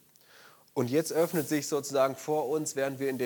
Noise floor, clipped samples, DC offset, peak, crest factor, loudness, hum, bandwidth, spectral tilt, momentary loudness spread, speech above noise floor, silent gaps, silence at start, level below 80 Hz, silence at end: -57 dBFS; under 0.1%; under 0.1%; -14 dBFS; 18 dB; -30 LUFS; none; 19 kHz; -4.5 dB/octave; 4 LU; 28 dB; none; 0.75 s; -80 dBFS; 0 s